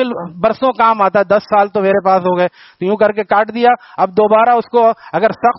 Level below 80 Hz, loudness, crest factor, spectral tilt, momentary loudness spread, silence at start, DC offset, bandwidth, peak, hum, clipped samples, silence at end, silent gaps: -56 dBFS; -13 LUFS; 12 dB; -4 dB/octave; 6 LU; 0 s; under 0.1%; 6 kHz; 0 dBFS; none; under 0.1%; 0.05 s; none